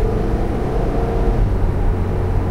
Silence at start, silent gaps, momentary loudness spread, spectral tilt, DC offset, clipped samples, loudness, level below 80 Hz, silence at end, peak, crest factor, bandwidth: 0 s; none; 2 LU; -9 dB/octave; 3%; under 0.1%; -20 LUFS; -20 dBFS; 0 s; -4 dBFS; 12 dB; 6.6 kHz